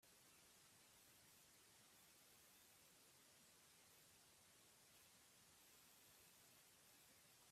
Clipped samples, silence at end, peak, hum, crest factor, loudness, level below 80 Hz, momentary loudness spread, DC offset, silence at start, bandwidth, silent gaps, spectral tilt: under 0.1%; 0 s; -58 dBFS; none; 14 dB; -69 LUFS; under -90 dBFS; 1 LU; under 0.1%; 0 s; 15.5 kHz; none; -1 dB/octave